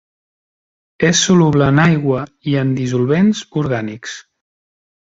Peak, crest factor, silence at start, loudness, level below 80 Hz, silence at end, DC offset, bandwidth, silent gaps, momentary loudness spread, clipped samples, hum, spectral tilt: 0 dBFS; 16 dB; 1 s; -15 LUFS; -46 dBFS; 0.9 s; under 0.1%; 7.8 kHz; none; 13 LU; under 0.1%; none; -5 dB/octave